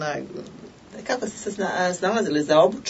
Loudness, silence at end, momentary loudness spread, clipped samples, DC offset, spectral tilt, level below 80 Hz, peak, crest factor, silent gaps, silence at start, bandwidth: -23 LUFS; 0 s; 19 LU; under 0.1%; under 0.1%; -4 dB/octave; -62 dBFS; -4 dBFS; 18 dB; none; 0 s; 8 kHz